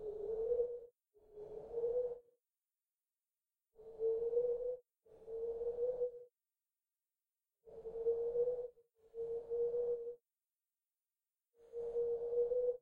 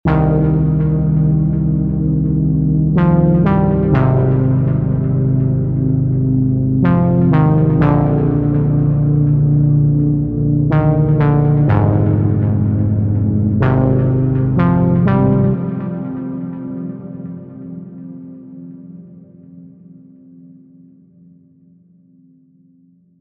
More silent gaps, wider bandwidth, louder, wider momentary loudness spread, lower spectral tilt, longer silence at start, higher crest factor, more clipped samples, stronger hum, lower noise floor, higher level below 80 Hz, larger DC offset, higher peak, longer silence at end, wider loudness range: neither; second, 1.7 kHz vs 3.6 kHz; second, -40 LUFS vs -14 LUFS; first, 18 LU vs 15 LU; second, -8 dB/octave vs -12.5 dB/octave; about the same, 0 s vs 0.05 s; about the same, 16 dB vs 12 dB; neither; neither; first, under -90 dBFS vs -51 dBFS; second, -70 dBFS vs -30 dBFS; neither; second, -26 dBFS vs -2 dBFS; second, 0.05 s vs 3.55 s; second, 4 LU vs 14 LU